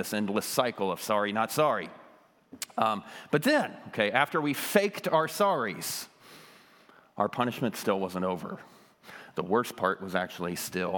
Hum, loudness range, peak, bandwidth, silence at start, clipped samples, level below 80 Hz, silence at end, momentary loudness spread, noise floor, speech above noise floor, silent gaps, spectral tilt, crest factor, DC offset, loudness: none; 6 LU; -8 dBFS; 19 kHz; 0 s; under 0.1%; -78 dBFS; 0 s; 11 LU; -58 dBFS; 29 dB; none; -4 dB/octave; 24 dB; under 0.1%; -29 LUFS